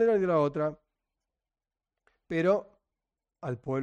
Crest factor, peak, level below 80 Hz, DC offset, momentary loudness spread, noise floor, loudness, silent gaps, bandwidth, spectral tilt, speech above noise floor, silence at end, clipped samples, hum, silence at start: 18 dB; -14 dBFS; -66 dBFS; under 0.1%; 12 LU; under -90 dBFS; -29 LUFS; none; 8.8 kHz; -8.5 dB/octave; over 63 dB; 0 s; under 0.1%; none; 0 s